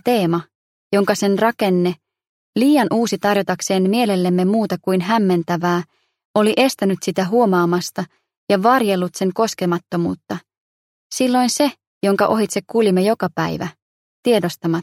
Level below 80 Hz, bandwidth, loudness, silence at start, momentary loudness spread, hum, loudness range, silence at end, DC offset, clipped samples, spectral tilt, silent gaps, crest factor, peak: -62 dBFS; 16 kHz; -18 LUFS; 0.05 s; 9 LU; none; 2 LU; 0 s; under 0.1%; under 0.1%; -5.5 dB/octave; 0.55-0.91 s, 2.29-2.53 s, 6.25-6.34 s, 8.37-8.47 s, 10.57-11.10 s, 11.87-12.01 s, 13.82-14.23 s; 16 dB; -2 dBFS